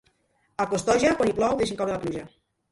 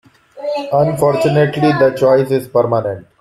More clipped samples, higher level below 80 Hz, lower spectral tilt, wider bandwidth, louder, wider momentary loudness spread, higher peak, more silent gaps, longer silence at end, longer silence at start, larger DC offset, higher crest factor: neither; about the same, -52 dBFS vs -52 dBFS; second, -4.5 dB/octave vs -7 dB/octave; second, 11.5 kHz vs 14.5 kHz; second, -25 LUFS vs -14 LUFS; about the same, 12 LU vs 10 LU; second, -8 dBFS vs -2 dBFS; neither; first, 0.45 s vs 0.2 s; first, 0.6 s vs 0.35 s; neither; first, 18 dB vs 12 dB